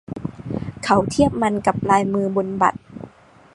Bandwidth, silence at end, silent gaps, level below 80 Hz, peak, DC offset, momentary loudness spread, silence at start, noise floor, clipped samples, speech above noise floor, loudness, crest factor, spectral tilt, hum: 11.5 kHz; 0.45 s; none; -46 dBFS; 0 dBFS; under 0.1%; 15 LU; 0.1 s; -47 dBFS; under 0.1%; 29 dB; -20 LUFS; 20 dB; -6 dB/octave; none